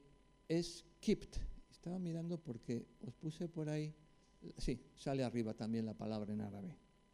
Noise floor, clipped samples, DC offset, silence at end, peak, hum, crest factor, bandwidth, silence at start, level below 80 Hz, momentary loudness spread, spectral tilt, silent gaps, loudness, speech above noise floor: -65 dBFS; under 0.1%; under 0.1%; 0.4 s; -24 dBFS; none; 20 dB; 12.5 kHz; 0.05 s; -56 dBFS; 13 LU; -6.5 dB/octave; none; -44 LUFS; 22 dB